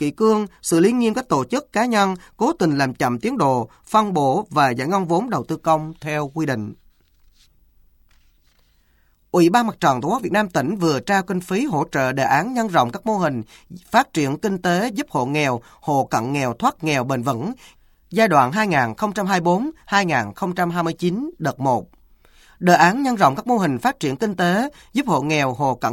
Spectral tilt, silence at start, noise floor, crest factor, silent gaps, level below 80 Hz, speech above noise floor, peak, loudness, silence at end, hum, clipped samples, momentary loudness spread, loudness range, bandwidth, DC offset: -5.5 dB/octave; 0 s; -59 dBFS; 20 dB; none; -54 dBFS; 40 dB; 0 dBFS; -20 LUFS; 0 s; none; under 0.1%; 7 LU; 4 LU; 17 kHz; under 0.1%